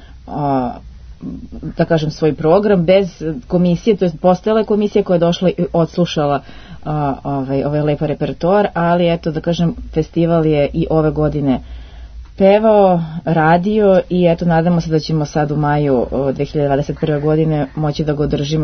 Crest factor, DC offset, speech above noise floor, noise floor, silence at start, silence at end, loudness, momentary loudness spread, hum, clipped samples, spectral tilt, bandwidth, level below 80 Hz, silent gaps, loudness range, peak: 14 dB; under 0.1%; 20 dB; -34 dBFS; 0 s; 0 s; -15 LUFS; 9 LU; none; under 0.1%; -8 dB/octave; 6.6 kHz; -36 dBFS; none; 4 LU; 0 dBFS